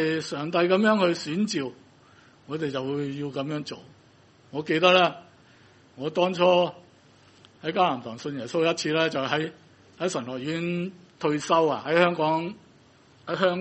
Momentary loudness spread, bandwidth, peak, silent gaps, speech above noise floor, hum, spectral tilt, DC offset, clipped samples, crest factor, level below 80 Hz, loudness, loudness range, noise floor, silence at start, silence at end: 14 LU; 8.4 kHz; -4 dBFS; none; 32 dB; none; -5 dB/octave; under 0.1%; under 0.1%; 22 dB; -70 dBFS; -25 LUFS; 4 LU; -56 dBFS; 0 s; 0 s